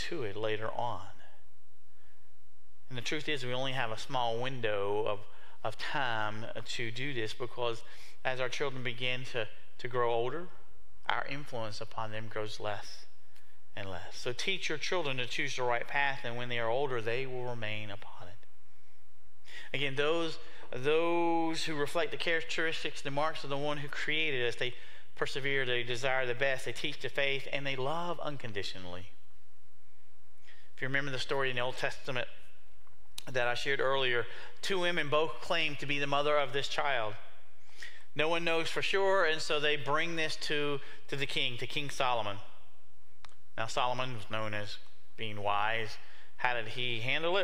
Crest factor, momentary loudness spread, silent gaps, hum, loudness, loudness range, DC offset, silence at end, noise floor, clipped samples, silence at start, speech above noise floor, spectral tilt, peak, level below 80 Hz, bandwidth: 24 dB; 13 LU; none; none; -34 LUFS; 7 LU; 3%; 0 s; -69 dBFS; under 0.1%; 0 s; 35 dB; -4 dB/octave; -10 dBFS; -66 dBFS; 16 kHz